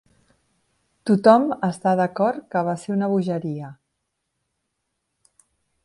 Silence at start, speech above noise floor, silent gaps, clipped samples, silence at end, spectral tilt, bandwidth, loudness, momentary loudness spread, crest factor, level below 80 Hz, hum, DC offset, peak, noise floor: 1.05 s; 57 dB; none; under 0.1%; 2.1 s; -7.5 dB/octave; 11.5 kHz; -21 LUFS; 16 LU; 22 dB; -68 dBFS; none; under 0.1%; 0 dBFS; -77 dBFS